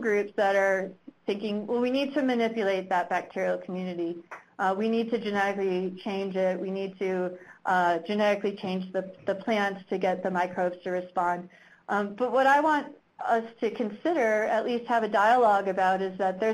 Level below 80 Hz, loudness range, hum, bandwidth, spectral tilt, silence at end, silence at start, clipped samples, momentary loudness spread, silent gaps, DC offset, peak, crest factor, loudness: -72 dBFS; 4 LU; none; 13.5 kHz; -6 dB/octave; 0 s; 0 s; under 0.1%; 10 LU; none; under 0.1%; -10 dBFS; 16 dB; -27 LUFS